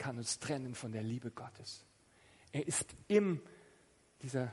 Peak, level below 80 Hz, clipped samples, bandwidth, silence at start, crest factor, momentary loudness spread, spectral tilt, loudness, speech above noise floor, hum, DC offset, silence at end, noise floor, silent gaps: -18 dBFS; -72 dBFS; under 0.1%; 11.5 kHz; 0 s; 22 dB; 17 LU; -4.5 dB/octave; -38 LUFS; 29 dB; none; under 0.1%; 0 s; -68 dBFS; none